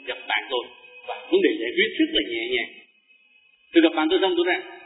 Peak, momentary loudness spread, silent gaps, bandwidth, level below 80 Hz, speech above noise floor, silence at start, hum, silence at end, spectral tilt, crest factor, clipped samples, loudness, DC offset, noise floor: -4 dBFS; 15 LU; none; 4 kHz; -60 dBFS; 37 dB; 0.05 s; none; 0 s; -6.5 dB/octave; 20 dB; under 0.1%; -22 LUFS; under 0.1%; -59 dBFS